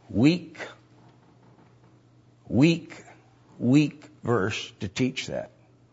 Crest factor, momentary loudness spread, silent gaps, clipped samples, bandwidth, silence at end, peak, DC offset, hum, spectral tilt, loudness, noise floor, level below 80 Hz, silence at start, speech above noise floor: 20 dB; 19 LU; none; under 0.1%; 8 kHz; 0.45 s; -6 dBFS; under 0.1%; none; -6.5 dB/octave; -26 LUFS; -57 dBFS; -62 dBFS; 0.1 s; 33 dB